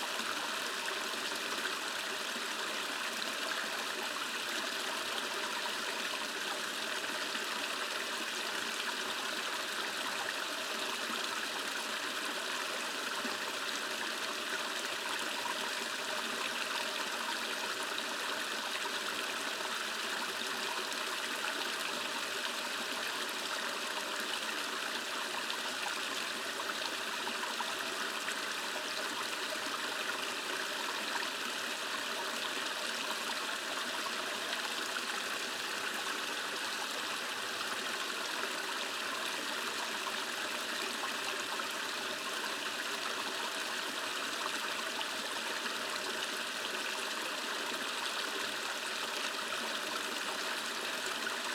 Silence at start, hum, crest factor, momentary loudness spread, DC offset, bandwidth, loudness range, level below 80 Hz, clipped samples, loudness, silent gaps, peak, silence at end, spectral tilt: 0 s; none; 18 dB; 1 LU; under 0.1%; 19.5 kHz; 0 LU; under -90 dBFS; under 0.1%; -35 LUFS; none; -18 dBFS; 0 s; 0 dB/octave